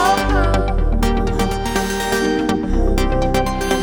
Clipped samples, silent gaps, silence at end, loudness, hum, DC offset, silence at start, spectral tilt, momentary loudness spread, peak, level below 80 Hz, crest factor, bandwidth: under 0.1%; none; 0 s; -18 LUFS; none; under 0.1%; 0 s; -5 dB/octave; 3 LU; -2 dBFS; -20 dBFS; 14 dB; over 20 kHz